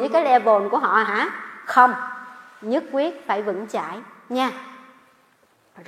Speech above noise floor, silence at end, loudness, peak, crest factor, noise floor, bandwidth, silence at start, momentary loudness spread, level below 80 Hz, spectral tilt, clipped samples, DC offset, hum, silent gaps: 40 dB; 0.05 s; -21 LUFS; 0 dBFS; 22 dB; -60 dBFS; 14.5 kHz; 0 s; 20 LU; -78 dBFS; -4.5 dB/octave; under 0.1%; under 0.1%; none; none